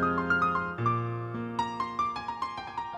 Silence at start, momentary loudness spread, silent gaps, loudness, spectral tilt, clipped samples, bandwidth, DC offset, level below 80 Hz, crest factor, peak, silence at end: 0 s; 9 LU; none; -30 LUFS; -6.5 dB/octave; under 0.1%; 9.4 kHz; under 0.1%; -58 dBFS; 16 dB; -14 dBFS; 0 s